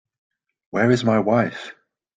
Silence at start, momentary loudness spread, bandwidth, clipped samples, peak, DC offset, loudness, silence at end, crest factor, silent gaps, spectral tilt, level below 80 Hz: 0.75 s; 16 LU; 9 kHz; under 0.1%; -4 dBFS; under 0.1%; -20 LUFS; 0.45 s; 18 dB; none; -7 dB/octave; -60 dBFS